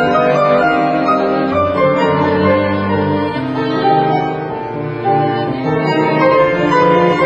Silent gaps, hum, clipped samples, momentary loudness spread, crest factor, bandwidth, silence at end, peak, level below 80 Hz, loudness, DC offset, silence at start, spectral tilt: none; none; under 0.1%; 7 LU; 14 dB; 7.8 kHz; 0 s; 0 dBFS; -46 dBFS; -14 LUFS; under 0.1%; 0 s; -7.5 dB/octave